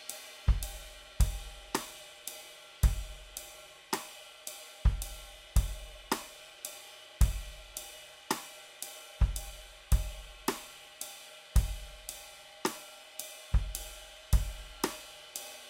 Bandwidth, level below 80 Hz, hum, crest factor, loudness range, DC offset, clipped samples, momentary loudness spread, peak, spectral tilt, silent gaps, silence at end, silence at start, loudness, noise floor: 16 kHz; -36 dBFS; none; 24 dB; 2 LU; under 0.1%; under 0.1%; 14 LU; -10 dBFS; -4 dB/octave; none; 0 s; 0 s; -37 LUFS; -52 dBFS